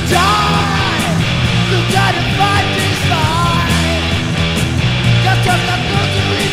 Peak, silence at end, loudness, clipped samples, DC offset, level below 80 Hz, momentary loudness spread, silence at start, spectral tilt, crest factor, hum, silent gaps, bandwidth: 0 dBFS; 0 s; -13 LUFS; under 0.1%; under 0.1%; -28 dBFS; 3 LU; 0 s; -4.5 dB/octave; 12 dB; none; none; 16 kHz